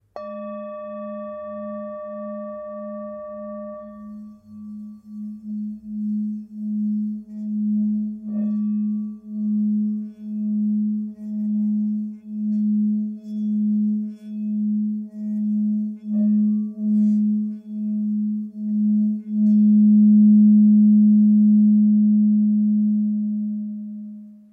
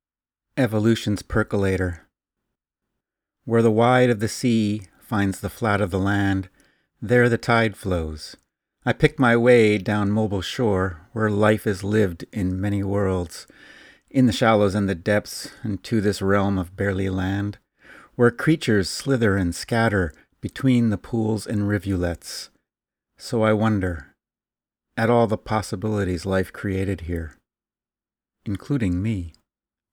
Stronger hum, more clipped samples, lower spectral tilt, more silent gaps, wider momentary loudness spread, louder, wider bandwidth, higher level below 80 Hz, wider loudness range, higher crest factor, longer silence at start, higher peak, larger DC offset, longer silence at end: neither; neither; first, -13 dB/octave vs -6.5 dB/octave; neither; first, 19 LU vs 13 LU; about the same, -20 LUFS vs -22 LUFS; second, 1.9 kHz vs 18 kHz; second, -70 dBFS vs -46 dBFS; first, 18 LU vs 5 LU; second, 12 dB vs 22 dB; second, 0.15 s vs 0.55 s; second, -8 dBFS vs 0 dBFS; neither; second, 0.15 s vs 0.65 s